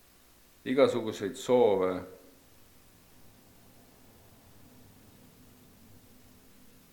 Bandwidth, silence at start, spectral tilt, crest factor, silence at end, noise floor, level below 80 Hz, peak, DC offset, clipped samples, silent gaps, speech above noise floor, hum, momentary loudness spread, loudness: 19 kHz; 0.65 s; -5.5 dB/octave; 24 dB; 4.8 s; -60 dBFS; -68 dBFS; -10 dBFS; under 0.1%; under 0.1%; none; 33 dB; none; 16 LU; -28 LUFS